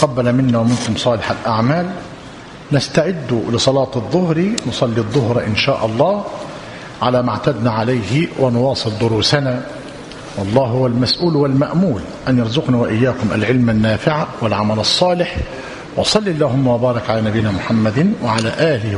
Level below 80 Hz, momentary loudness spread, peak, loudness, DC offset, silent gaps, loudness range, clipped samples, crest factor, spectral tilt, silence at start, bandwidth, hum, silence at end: -42 dBFS; 10 LU; 0 dBFS; -16 LUFS; under 0.1%; none; 2 LU; under 0.1%; 16 dB; -6 dB/octave; 0 s; 11 kHz; none; 0 s